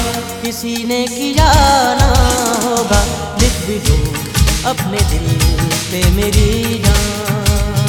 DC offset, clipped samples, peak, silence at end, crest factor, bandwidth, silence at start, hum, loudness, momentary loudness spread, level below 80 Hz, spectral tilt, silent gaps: 0.2%; under 0.1%; 0 dBFS; 0 s; 12 dB; 19.5 kHz; 0 s; none; -14 LUFS; 7 LU; -18 dBFS; -4.5 dB/octave; none